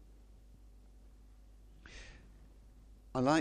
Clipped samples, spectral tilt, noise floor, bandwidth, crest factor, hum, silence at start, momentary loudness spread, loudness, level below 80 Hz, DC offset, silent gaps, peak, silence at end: under 0.1%; -5.5 dB/octave; -58 dBFS; 10.5 kHz; 24 dB; none; 1.9 s; 23 LU; -38 LUFS; -58 dBFS; under 0.1%; none; -16 dBFS; 0 s